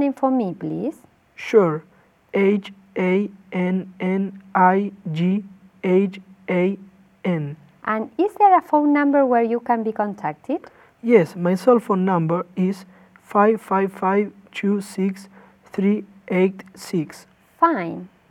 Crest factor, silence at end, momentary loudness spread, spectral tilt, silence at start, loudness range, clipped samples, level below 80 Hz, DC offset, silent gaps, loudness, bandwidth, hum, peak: 20 dB; 0.25 s; 12 LU; -8 dB/octave; 0 s; 4 LU; under 0.1%; -70 dBFS; under 0.1%; none; -21 LUFS; 13 kHz; none; -2 dBFS